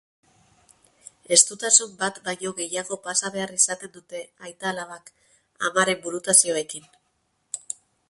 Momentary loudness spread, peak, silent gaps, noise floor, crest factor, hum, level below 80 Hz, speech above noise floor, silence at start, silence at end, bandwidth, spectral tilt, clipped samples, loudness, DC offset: 21 LU; -2 dBFS; none; -71 dBFS; 24 dB; none; -70 dBFS; 47 dB; 1.3 s; 0.5 s; 12 kHz; -0.5 dB/octave; under 0.1%; -21 LUFS; under 0.1%